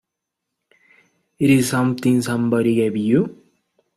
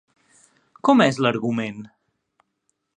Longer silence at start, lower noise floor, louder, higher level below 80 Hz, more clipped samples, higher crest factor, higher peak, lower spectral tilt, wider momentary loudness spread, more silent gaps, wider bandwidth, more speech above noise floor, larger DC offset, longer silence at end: first, 1.4 s vs 0.85 s; first, -81 dBFS vs -74 dBFS; about the same, -18 LUFS vs -20 LUFS; first, -58 dBFS vs -66 dBFS; neither; second, 16 dB vs 22 dB; about the same, -4 dBFS vs -2 dBFS; about the same, -6 dB/octave vs -6 dB/octave; second, 4 LU vs 14 LU; neither; first, 15 kHz vs 10 kHz; first, 64 dB vs 54 dB; neither; second, 0.65 s vs 1.1 s